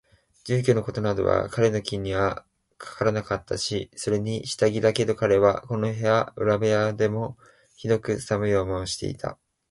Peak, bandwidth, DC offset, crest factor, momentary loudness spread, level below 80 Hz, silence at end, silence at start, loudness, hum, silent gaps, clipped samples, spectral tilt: -6 dBFS; 11.5 kHz; under 0.1%; 18 dB; 10 LU; -50 dBFS; 0.35 s; 0.45 s; -25 LUFS; none; none; under 0.1%; -5.5 dB/octave